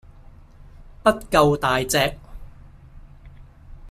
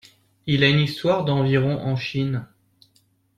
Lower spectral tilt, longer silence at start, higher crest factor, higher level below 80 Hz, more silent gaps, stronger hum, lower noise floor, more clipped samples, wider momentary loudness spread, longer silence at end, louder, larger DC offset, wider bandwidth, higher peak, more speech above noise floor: second, -4 dB/octave vs -7 dB/octave; first, 0.75 s vs 0.45 s; about the same, 22 dB vs 18 dB; first, -42 dBFS vs -54 dBFS; neither; neither; second, -46 dBFS vs -63 dBFS; neither; second, 6 LU vs 9 LU; second, 0 s vs 0.9 s; about the same, -20 LUFS vs -21 LUFS; neither; first, 15.5 kHz vs 10 kHz; about the same, -2 dBFS vs -4 dBFS; second, 27 dB vs 43 dB